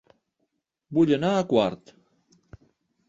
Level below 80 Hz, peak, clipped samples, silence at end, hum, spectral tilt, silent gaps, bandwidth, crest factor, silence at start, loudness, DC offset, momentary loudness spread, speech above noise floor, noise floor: -62 dBFS; -8 dBFS; under 0.1%; 1.35 s; none; -7 dB/octave; none; 7.8 kHz; 20 dB; 0.9 s; -23 LUFS; under 0.1%; 8 LU; 55 dB; -77 dBFS